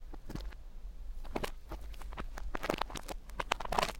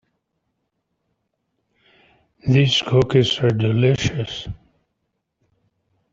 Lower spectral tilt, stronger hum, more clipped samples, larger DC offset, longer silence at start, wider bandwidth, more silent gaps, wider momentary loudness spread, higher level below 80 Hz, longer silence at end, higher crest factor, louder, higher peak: second, -3.5 dB/octave vs -6 dB/octave; neither; neither; neither; second, 0 s vs 2.45 s; first, 17 kHz vs 7.8 kHz; neither; about the same, 14 LU vs 14 LU; about the same, -44 dBFS vs -48 dBFS; second, 0 s vs 1.6 s; first, 32 dB vs 20 dB; second, -41 LUFS vs -18 LUFS; second, -8 dBFS vs -2 dBFS